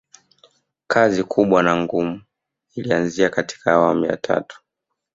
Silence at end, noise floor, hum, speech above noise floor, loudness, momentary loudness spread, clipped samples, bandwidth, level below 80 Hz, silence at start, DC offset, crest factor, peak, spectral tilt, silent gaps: 0.6 s; -80 dBFS; none; 61 dB; -19 LUFS; 12 LU; under 0.1%; 7.8 kHz; -56 dBFS; 0.9 s; under 0.1%; 18 dB; -2 dBFS; -5.5 dB/octave; none